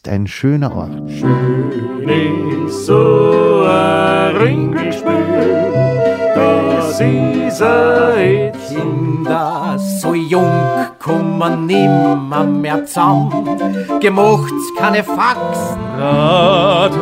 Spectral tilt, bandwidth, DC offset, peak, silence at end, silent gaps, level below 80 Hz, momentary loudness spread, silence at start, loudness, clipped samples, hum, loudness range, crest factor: -6.5 dB/octave; 16 kHz; under 0.1%; 0 dBFS; 0 s; none; -46 dBFS; 8 LU; 0.05 s; -13 LUFS; under 0.1%; none; 2 LU; 12 dB